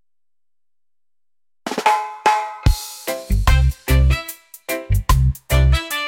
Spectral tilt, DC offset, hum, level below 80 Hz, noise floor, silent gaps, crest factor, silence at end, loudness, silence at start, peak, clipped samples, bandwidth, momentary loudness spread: -5 dB/octave; under 0.1%; none; -22 dBFS; under -90 dBFS; none; 16 dB; 0 s; -19 LUFS; 1.65 s; -2 dBFS; under 0.1%; 17 kHz; 11 LU